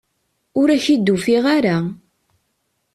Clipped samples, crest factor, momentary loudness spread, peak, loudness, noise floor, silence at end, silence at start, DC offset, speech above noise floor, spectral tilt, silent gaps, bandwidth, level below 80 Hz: under 0.1%; 14 dB; 9 LU; -4 dBFS; -17 LUFS; -70 dBFS; 1 s; 0.55 s; under 0.1%; 54 dB; -6 dB/octave; none; 13 kHz; -58 dBFS